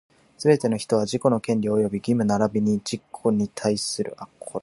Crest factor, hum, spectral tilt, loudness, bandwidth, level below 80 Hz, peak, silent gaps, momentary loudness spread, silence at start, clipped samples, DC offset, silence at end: 20 dB; none; -6 dB/octave; -23 LUFS; 11.5 kHz; -60 dBFS; -4 dBFS; none; 8 LU; 0.4 s; under 0.1%; under 0.1%; 0.05 s